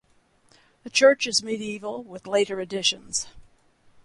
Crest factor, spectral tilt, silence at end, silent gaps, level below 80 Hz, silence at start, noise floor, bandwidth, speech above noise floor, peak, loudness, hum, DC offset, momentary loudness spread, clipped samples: 20 dB; -1.5 dB/octave; 0.65 s; none; -62 dBFS; 0.85 s; -62 dBFS; 11.5 kHz; 37 dB; -6 dBFS; -23 LUFS; none; under 0.1%; 16 LU; under 0.1%